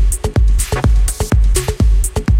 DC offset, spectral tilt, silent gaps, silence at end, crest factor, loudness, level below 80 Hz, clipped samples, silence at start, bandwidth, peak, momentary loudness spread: under 0.1%; -5 dB/octave; none; 0 s; 12 dB; -15 LUFS; -14 dBFS; under 0.1%; 0 s; 16.5 kHz; 0 dBFS; 2 LU